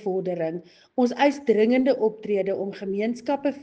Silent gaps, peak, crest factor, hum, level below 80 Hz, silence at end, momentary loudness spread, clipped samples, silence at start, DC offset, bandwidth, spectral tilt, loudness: none; -6 dBFS; 18 dB; none; -70 dBFS; 0 s; 9 LU; under 0.1%; 0 s; under 0.1%; 8.4 kHz; -6.5 dB/octave; -24 LUFS